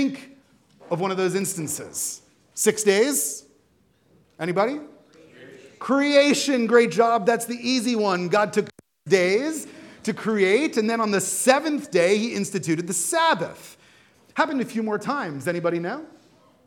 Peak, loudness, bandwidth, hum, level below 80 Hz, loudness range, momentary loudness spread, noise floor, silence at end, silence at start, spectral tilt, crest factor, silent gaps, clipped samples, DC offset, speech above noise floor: -2 dBFS; -22 LUFS; 18 kHz; none; -74 dBFS; 4 LU; 13 LU; -62 dBFS; 0.6 s; 0 s; -3.5 dB/octave; 22 dB; none; under 0.1%; under 0.1%; 40 dB